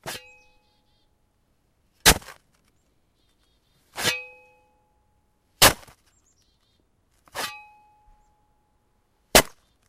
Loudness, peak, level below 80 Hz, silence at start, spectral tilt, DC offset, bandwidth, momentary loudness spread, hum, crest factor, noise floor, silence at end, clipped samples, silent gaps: -20 LUFS; 0 dBFS; -44 dBFS; 0.05 s; -1.5 dB/octave; under 0.1%; 16 kHz; 22 LU; none; 28 dB; -68 dBFS; 0.4 s; under 0.1%; none